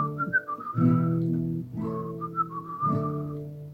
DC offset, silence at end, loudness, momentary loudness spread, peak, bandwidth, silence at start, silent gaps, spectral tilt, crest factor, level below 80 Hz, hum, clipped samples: under 0.1%; 0 s; -28 LUFS; 10 LU; -10 dBFS; 4 kHz; 0 s; none; -10.5 dB/octave; 18 dB; -58 dBFS; none; under 0.1%